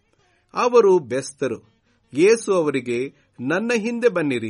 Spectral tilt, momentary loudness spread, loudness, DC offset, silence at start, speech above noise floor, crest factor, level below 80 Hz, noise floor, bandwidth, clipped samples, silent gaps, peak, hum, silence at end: -5 dB/octave; 15 LU; -20 LUFS; under 0.1%; 0.55 s; 43 dB; 18 dB; -68 dBFS; -62 dBFS; 11.5 kHz; under 0.1%; none; -4 dBFS; none; 0 s